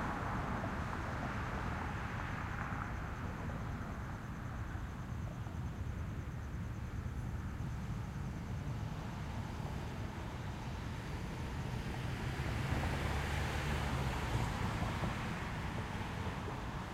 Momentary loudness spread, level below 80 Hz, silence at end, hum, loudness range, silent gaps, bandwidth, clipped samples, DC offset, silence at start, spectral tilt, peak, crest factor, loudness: 6 LU; -46 dBFS; 0 s; none; 5 LU; none; 16 kHz; under 0.1%; under 0.1%; 0 s; -6 dB/octave; -22 dBFS; 18 dB; -41 LUFS